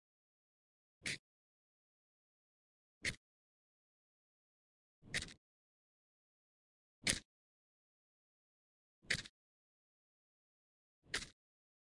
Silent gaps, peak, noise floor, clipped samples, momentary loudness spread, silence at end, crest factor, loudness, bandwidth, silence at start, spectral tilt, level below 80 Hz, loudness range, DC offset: 1.19-3.01 s, 3.17-5.02 s, 5.37-7.02 s, 7.25-9.02 s, 9.29-11.02 s; -10 dBFS; under -90 dBFS; under 0.1%; 15 LU; 0.55 s; 40 dB; -43 LUFS; 11.5 kHz; 1.05 s; -1.5 dB/octave; -68 dBFS; 7 LU; under 0.1%